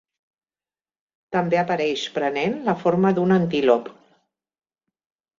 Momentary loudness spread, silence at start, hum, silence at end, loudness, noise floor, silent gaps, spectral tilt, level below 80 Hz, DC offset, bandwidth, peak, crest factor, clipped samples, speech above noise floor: 6 LU; 1.3 s; none; 1.5 s; -21 LUFS; under -90 dBFS; none; -6.5 dB/octave; -64 dBFS; under 0.1%; 7.6 kHz; -4 dBFS; 20 dB; under 0.1%; over 70 dB